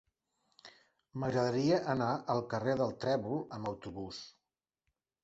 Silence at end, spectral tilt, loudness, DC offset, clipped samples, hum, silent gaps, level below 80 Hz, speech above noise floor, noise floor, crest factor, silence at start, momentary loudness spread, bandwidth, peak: 0.95 s; -5.5 dB/octave; -35 LUFS; under 0.1%; under 0.1%; none; none; -66 dBFS; 55 dB; -89 dBFS; 18 dB; 0.65 s; 14 LU; 8 kHz; -18 dBFS